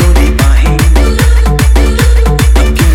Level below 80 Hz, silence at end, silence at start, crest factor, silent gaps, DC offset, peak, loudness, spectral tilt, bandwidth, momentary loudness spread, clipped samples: -6 dBFS; 0 s; 0 s; 6 dB; none; under 0.1%; 0 dBFS; -8 LUFS; -5.5 dB/octave; 16 kHz; 0 LU; 0.8%